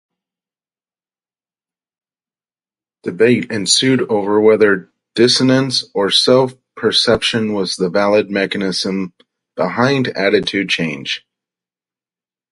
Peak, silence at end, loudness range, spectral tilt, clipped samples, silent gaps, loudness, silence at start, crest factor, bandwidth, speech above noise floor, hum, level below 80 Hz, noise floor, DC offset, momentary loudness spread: 0 dBFS; 1.35 s; 6 LU; -4 dB/octave; under 0.1%; none; -15 LUFS; 3.05 s; 16 dB; 11.5 kHz; over 75 dB; none; -54 dBFS; under -90 dBFS; under 0.1%; 11 LU